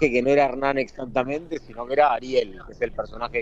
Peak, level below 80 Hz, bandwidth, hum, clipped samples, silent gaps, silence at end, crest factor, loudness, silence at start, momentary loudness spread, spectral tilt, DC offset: -6 dBFS; -46 dBFS; 8 kHz; none; under 0.1%; none; 0 s; 18 dB; -24 LUFS; 0 s; 11 LU; -6 dB/octave; under 0.1%